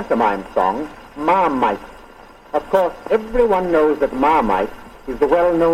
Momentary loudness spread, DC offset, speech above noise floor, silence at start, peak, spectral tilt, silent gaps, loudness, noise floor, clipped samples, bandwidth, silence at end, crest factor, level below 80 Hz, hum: 11 LU; under 0.1%; 25 dB; 0 s; -2 dBFS; -6.5 dB/octave; none; -18 LUFS; -42 dBFS; under 0.1%; 15 kHz; 0 s; 16 dB; -40 dBFS; none